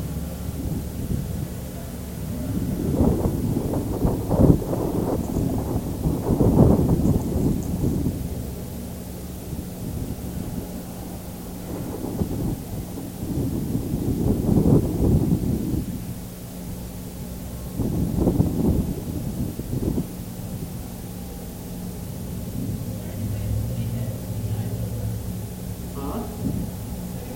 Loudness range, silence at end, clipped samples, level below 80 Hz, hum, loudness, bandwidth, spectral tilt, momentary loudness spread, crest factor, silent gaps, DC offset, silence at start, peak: 9 LU; 0 s; under 0.1%; -34 dBFS; none; -26 LUFS; 17 kHz; -7.5 dB/octave; 14 LU; 24 dB; none; under 0.1%; 0 s; 0 dBFS